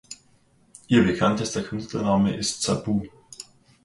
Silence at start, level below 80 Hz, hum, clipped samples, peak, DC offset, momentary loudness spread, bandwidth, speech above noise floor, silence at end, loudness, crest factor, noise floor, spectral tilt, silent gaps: 0.1 s; -50 dBFS; none; under 0.1%; -6 dBFS; under 0.1%; 21 LU; 11.5 kHz; 37 dB; 0.45 s; -23 LUFS; 20 dB; -60 dBFS; -5 dB/octave; none